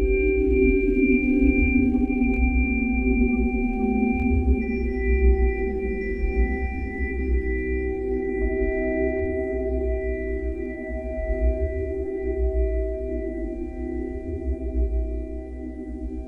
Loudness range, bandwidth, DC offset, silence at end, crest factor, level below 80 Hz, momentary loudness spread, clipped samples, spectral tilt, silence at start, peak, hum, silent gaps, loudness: 7 LU; 2.9 kHz; under 0.1%; 0 s; 16 dB; -26 dBFS; 11 LU; under 0.1%; -11 dB/octave; 0 s; -6 dBFS; none; none; -24 LUFS